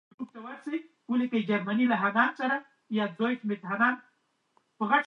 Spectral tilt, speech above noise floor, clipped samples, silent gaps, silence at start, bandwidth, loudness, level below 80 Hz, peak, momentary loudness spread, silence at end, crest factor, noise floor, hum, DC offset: -7 dB/octave; 44 dB; under 0.1%; none; 0.2 s; 6.2 kHz; -29 LUFS; -84 dBFS; -10 dBFS; 14 LU; 0 s; 20 dB; -72 dBFS; none; under 0.1%